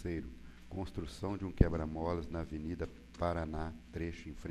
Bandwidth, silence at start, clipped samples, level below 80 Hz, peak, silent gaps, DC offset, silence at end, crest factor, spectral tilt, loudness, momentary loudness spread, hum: 13 kHz; 0 s; under 0.1%; -44 dBFS; -10 dBFS; none; under 0.1%; 0 s; 28 dB; -8 dB/octave; -39 LUFS; 13 LU; none